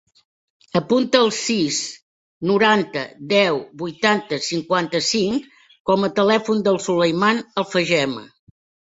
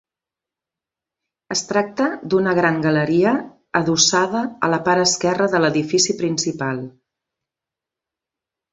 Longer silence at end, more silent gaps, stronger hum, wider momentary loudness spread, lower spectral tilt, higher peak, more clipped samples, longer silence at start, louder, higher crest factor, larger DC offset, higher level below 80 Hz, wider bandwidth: second, 0.65 s vs 1.85 s; first, 2.02-2.41 s, 5.80-5.85 s vs none; neither; about the same, 9 LU vs 9 LU; about the same, -4 dB/octave vs -3.5 dB/octave; about the same, -2 dBFS vs -2 dBFS; neither; second, 0.75 s vs 1.5 s; about the same, -19 LUFS vs -18 LUFS; about the same, 18 dB vs 20 dB; neither; about the same, -62 dBFS vs -60 dBFS; about the same, 8 kHz vs 8 kHz